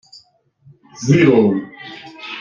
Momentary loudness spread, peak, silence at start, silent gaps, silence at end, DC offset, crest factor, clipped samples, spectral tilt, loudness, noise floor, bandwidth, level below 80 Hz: 22 LU; -2 dBFS; 1 s; none; 0 s; under 0.1%; 16 dB; under 0.1%; -6.5 dB/octave; -14 LUFS; -53 dBFS; 7.4 kHz; -54 dBFS